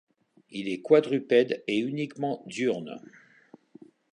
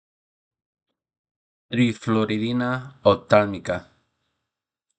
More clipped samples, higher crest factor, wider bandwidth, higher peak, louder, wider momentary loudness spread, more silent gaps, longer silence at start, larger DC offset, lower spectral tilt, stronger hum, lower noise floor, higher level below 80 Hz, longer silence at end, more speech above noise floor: neither; about the same, 22 dB vs 24 dB; first, 10 kHz vs 9 kHz; second, -6 dBFS vs 0 dBFS; second, -27 LUFS vs -22 LUFS; first, 15 LU vs 11 LU; neither; second, 0.5 s vs 1.7 s; neither; about the same, -6 dB/octave vs -7 dB/octave; neither; second, -56 dBFS vs -85 dBFS; second, -78 dBFS vs -64 dBFS; about the same, 1.15 s vs 1.15 s; second, 30 dB vs 63 dB